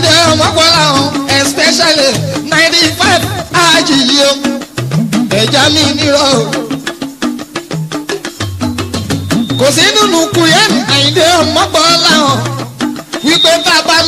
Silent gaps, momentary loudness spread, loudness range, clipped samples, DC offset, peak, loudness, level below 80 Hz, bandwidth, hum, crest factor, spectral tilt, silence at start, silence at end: none; 12 LU; 6 LU; 0.4%; under 0.1%; 0 dBFS; -9 LUFS; -40 dBFS; over 20 kHz; none; 10 dB; -3 dB/octave; 0 s; 0 s